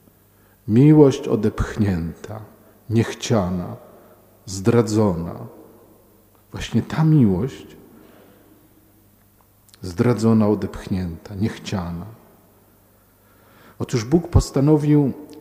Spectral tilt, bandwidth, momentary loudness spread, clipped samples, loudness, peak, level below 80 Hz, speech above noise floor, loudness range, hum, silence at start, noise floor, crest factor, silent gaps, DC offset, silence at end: -7.5 dB/octave; 16 kHz; 20 LU; under 0.1%; -19 LUFS; 0 dBFS; -38 dBFS; 37 dB; 6 LU; 50 Hz at -50 dBFS; 0.65 s; -55 dBFS; 20 dB; none; under 0.1%; 0 s